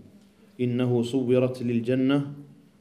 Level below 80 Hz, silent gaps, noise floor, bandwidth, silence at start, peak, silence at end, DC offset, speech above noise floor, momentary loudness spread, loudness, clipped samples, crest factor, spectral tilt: -70 dBFS; none; -54 dBFS; 11.5 kHz; 0.6 s; -10 dBFS; 0.35 s; under 0.1%; 30 dB; 7 LU; -25 LUFS; under 0.1%; 16 dB; -8 dB/octave